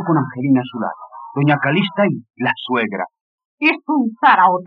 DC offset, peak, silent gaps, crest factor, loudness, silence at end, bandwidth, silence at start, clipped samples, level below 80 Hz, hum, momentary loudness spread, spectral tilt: under 0.1%; -2 dBFS; 2.30-2.34 s, 3.21-3.38 s, 3.45-3.58 s; 16 dB; -17 LUFS; 0 s; 5.4 kHz; 0 s; under 0.1%; -72 dBFS; none; 13 LU; -9 dB/octave